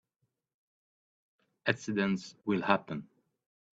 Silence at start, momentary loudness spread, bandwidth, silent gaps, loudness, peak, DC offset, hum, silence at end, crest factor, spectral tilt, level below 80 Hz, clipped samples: 1.65 s; 10 LU; 8 kHz; none; -32 LUFS; -8 dBFS; under 0.1%; none; 0.7 s; 28 dB; -5.5 dB/octave; -74 dBFS; under 0.1%